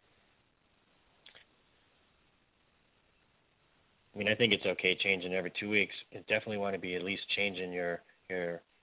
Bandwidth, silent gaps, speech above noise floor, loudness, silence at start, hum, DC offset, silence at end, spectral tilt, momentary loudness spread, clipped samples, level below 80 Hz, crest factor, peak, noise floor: 4 kHz; none; 38 dB; -32 LUFS; 1.25 s; none; under 0.1%; 0.25 s; -2 dB/octave; 11 LU; under 0.1%; -70 dBFS; 26 dB; -12 dBFS; -72 dBFS